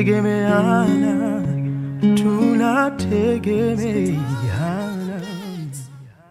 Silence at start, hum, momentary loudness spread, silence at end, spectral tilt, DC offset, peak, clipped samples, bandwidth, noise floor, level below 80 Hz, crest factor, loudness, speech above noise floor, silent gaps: 0 s; none; 13 LU; 0.2 s; -7.5 dB/octave; under 0.1%; -4 dBFS; under 0.1%; 15 kHz; -39 dBFS; -52 dBFS; 14 dB; -19 LUFS; 21 dB; none